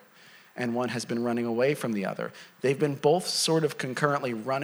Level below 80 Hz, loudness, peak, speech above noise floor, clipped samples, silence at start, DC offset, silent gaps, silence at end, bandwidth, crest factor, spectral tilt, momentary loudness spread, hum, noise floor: -80 dBFS; -28 LUFS; -8 dBFS; 27 dB; under 0.1%; 0.35 s; under 0.1%; none; 0 s; over 20 kHz; 20 dB; -4.5 dB/octave; 9 LU; none; -54 dBFS